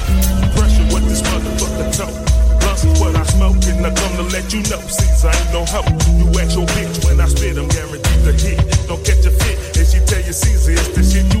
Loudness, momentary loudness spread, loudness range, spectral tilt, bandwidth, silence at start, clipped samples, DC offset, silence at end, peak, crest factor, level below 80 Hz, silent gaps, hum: -15 LUFS; 5 LU; 1 LU; -5 dB/octave; 16.5 kHz; 0 s; under 0.1%; under 0.1%; 0 s; -2 dBFS; 10 dB; -14 dBFS; none; none